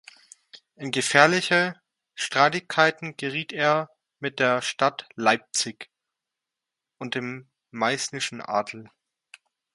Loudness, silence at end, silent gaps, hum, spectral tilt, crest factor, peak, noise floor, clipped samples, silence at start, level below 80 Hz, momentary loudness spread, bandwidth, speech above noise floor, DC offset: -24 LUFS; 0.9 s; none; none; -3 dB/octave; 26 dB; 0 dBFS; -87 dBFS; under 0.1%; 0.55 s; -72 dBFS; 19 LU; 11.5 kHz; 62 dB; under 0.1%